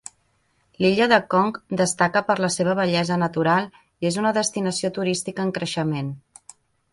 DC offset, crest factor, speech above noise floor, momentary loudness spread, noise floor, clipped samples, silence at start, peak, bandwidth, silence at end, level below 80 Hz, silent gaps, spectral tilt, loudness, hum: under 0.1%; 20 dB; 44 dB; 9 LU; -66 dBFS; under 0.1%; 0.8 s; -2 dBFS; 11.5 kHz; 0.75 s; -60 dBFS; none; -4.5 dB/octave; -22 LUFS; none